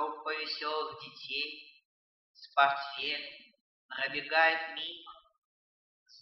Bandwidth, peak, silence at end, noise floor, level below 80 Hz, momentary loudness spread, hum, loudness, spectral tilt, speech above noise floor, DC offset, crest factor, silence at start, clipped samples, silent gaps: 6.2 kHz; -12 dBFS; 0 s; under -90 dBFS; -82 dBFS; 19 LU; none; -32 LUFS; -3 dB/octave; over 57 dB; under 0.1%; 24 dB; 0 s; under 0.1%; 1.85-2.34 s, 3.61-3.89 s, 5.38-6.06 s